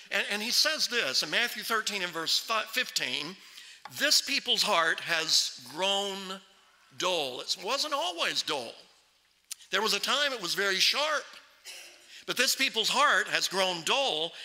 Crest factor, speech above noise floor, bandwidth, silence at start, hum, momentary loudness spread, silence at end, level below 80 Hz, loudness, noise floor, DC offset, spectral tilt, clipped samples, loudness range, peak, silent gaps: 24 dB; 38 dB; 16 kHz; 0 s; none; 19 LU; 0 s; -82 dBFS; -27 LUFS; -67 dBFS; under 0.1%; -0.5 dB/octave; under 0.1%; 4 LU; -6 dBFS; none